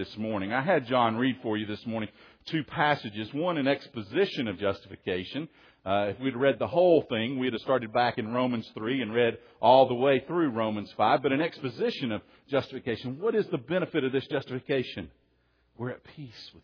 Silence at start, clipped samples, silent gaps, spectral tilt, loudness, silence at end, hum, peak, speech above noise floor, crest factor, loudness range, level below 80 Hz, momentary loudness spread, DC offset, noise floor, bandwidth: 0 s; under 0.1%; none; -7.5 dB/octave; -28 LUFS; 0.15 s; none; -8 dBFS; 41 dB; 20 dB; 5 LU; -66 dBFS; 13 LU; under 0.1%; -69 dBFS; 5.4 kHz